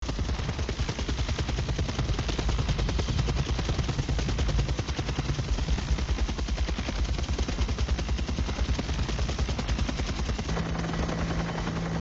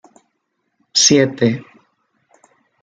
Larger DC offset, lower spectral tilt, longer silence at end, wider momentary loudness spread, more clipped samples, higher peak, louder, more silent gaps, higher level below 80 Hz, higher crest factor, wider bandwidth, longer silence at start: first, 0.1% vs under 0.1%; first, -5.5 dB/octave vs -3 dB/octave; second, 0 s vs 1.2 s; second, 2 LU vs 9 LU; neither; second, -14 dBFS vs -2 dBFS; second, -30 LUFS vs -14 LUFS; neither; first, -30 dBFS vs -58 dBFS; about the same, 14 dB vs 18 dB; second, 7.8 kHz vs 11 kHz; second, 0 s vs 0.95 s